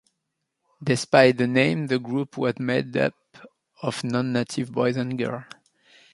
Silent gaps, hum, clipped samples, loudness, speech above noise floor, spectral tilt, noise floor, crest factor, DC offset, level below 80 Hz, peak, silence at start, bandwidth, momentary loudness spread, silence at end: none; none; under 0.1%; -24 LUFS; 57 dB; -6 dB/octave; -80 dBFS; 22 dB; under 0.1%; -66 dBFS; -2 dBFS; 0.8 s; 11.5 kHz; 12 LU; 0.7 s